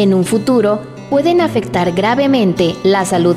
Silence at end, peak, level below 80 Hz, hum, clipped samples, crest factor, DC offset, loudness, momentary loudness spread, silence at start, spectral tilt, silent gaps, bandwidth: 0 s; -2 dBFS; -46 dBFS; none; under 0.1%; 12 dB; under 0.1%; -14 LUFS; 4 LU; 0 s; -6 dB/octave; none; 15 kHz